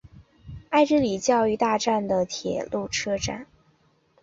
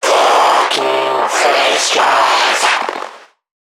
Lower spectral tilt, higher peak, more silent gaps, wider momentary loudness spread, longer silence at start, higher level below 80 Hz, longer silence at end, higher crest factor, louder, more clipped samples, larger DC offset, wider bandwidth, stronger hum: first, -4 dB/octave vs 0 dB/octave; second, -8 dBFS vs 0 dBFS; neither; first, 10 LU vs 7 LU; about the same, 0.05 s vs 0 s; first, -52 dBFS vs -70 dBFS; first, 0.8 s vs 0.45 s; first, 18 dB vs 12 dB; second, -24 LUFS vs -12 LUFS; neither; neither; second, 8 kHz vs 18.5 kHz; neither